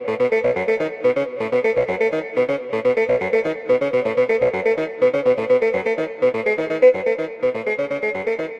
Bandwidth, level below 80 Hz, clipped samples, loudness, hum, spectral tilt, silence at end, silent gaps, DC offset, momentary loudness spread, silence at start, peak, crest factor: 7.6 kHz; -58 dBFS; under 0.1%; -20 LUFS; none; -6.5 dB/octave; 0 s; none; under 0.1%; 5 LU; 0 s; -4 dBFS; 16 dB